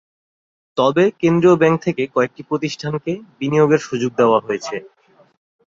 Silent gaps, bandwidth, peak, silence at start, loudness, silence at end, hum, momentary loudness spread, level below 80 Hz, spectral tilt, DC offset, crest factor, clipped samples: none; 7.6 kHz; -2 dBFS; 0.75 s; -17 LUFS; 0.8 s; none; 11 LU; -60 dBFS; -6.5 dB/octave; under 0.1%; 16 dB; under 0.1%